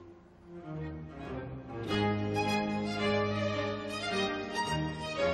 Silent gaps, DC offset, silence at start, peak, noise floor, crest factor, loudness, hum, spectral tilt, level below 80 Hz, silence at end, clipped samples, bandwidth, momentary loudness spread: none; under 0.1%; 0 s; -18 dBFS; -54 dBFS; 16 dB; -33 LUFS; none; -5.5 dB/octave; -54 dBFS; 0 s; under 0.1%; 13 kHz; 12 LU